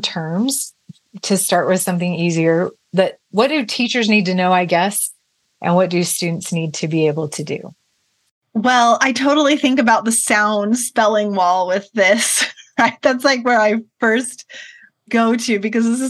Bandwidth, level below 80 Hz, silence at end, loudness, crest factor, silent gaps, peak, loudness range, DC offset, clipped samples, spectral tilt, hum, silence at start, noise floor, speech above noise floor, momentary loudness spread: 13 kHz; -70 dBFS; 0 s; -16 LUFS; 16 dB; 8.31-8.41 s; 0 dBFS; 4 LU; under 0.1%; under 0.1%; -4 dB/octave; none; 0 s; -65 dBFS; 49 dB; 8 LU